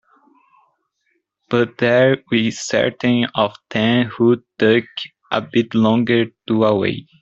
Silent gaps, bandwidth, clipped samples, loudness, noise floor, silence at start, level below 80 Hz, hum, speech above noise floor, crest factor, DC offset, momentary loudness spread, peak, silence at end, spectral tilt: none; 7.8 kHz; under 0.1%; -17 LUFS; -69 dBFS; 1.5 s; -58 dBFS; none; 52 dB; 16 dB; under 0.1%; 6 LU; -2 dBFS; 0.2 s; -5.5 dB/octave